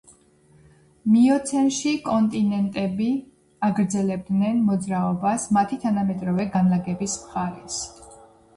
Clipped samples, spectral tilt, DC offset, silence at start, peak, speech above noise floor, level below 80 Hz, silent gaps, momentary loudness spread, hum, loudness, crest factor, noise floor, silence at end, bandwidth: under 0.1%; -6 dB/octave; under 0.1%; 1.05 s; -10 dBFS; 34 dB; -56 dBFS; none; 9 LU; none; -23 LUFS; 14 dB; -56 dBFS; 0.4 s; 11.5 kHz